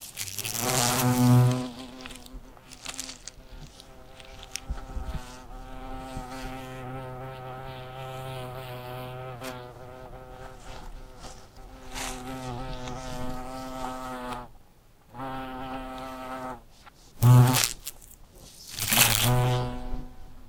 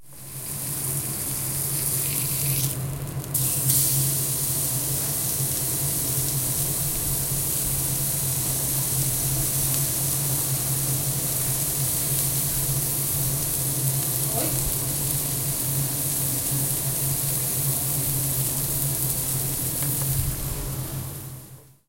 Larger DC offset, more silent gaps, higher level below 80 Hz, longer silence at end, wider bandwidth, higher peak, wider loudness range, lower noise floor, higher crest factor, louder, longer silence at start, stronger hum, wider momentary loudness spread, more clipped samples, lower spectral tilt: neither; neither; about the same, -44 dBFS vs -42 dBFS; second, 0 s vs 0.25 s; about the same, 18 kHz vs 16.5 kHz; first, 0 dBFS vs -4 dBFS; first, 17 LU vs 1 LU; first, -55 dBFS vs -46 dBFS; first, 30 dB vs 22 dB; second, -28 LUFS vs -23 LUFS; about the same, 0 s vs 0 s; neither; first, 26 LU vs 5 LU; neither; first, -4.5 dB/octave vs -3 dB/octave